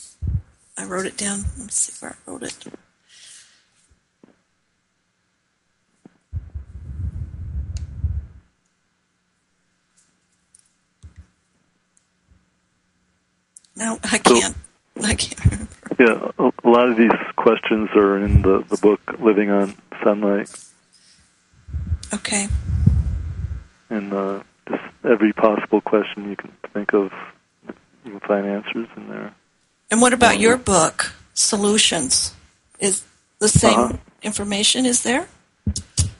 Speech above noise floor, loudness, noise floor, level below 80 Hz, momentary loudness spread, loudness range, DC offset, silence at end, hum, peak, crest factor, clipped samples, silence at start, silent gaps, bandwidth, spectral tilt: 50 dB; -19 LUFS; -69 dBFS; -34 dBFS; 19 LU; 17 LU; under 0.1%; 0.05 s; none; 0 dBFS; 22 dB; under 0.1%; 0 s; none; 11.5 kHz; -4 dB/octave